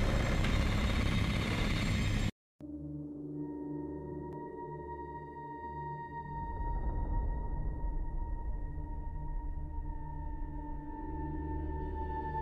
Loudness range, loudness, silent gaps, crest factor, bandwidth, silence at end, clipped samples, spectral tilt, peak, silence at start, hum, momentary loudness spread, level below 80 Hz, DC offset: 8 LU; -38 LUFS; 2.32-2.59 s; 16 dB; 14.5 kHz; 0 s; under 0.1%; -6 dB/octave; -18 dBFS; 0 s; none; 11 LU; -38 dBFS; under 0.1%